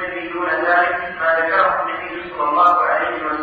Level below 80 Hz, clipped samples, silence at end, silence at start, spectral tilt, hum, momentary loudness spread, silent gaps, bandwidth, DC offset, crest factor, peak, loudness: -54 dBFS; under 0.1%; 0 s; 0 s; -6 dB/octave; none; 10 LU; none; 6.2 kHz; under 0.1%; 14 dB; -4 dBFS; -17 LUFS